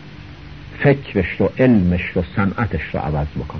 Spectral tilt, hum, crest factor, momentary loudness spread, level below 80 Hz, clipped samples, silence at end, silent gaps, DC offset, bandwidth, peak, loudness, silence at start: -9.5 dB/octave; none; 16 dB; 23 LU; -34 dBFS; under 0.1%; 0 s; none; 0.5%; 6.2 kHz; -2 dBFS; -18 LUFS; 0 s